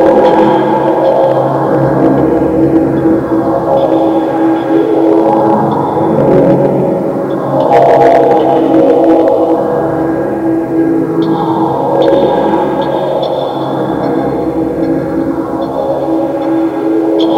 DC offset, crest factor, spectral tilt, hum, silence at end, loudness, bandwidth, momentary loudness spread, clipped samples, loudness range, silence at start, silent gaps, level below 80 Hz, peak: under 0.1%; 10 dB; -8.5 dB/octave; none; 0 s; -10 LUFS; 7.2 kHz; 7 LU; 1%; 5 LU; 0 s; none; -40 dBFS; 0 dBFS